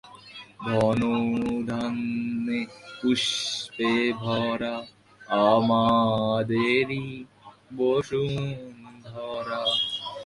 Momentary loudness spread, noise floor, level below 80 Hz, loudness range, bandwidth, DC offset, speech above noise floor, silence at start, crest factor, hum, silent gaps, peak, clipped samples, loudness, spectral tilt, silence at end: 17 LU; -46 dBFS; -58 dBFS; 4 LU; 11.5 kHz; under 0.1%; 21 dB; 0.05 s; 20 dB; none; none; -6 dBFS; under 0.1%; -25 LUFS; -5 dB/octave; 0 s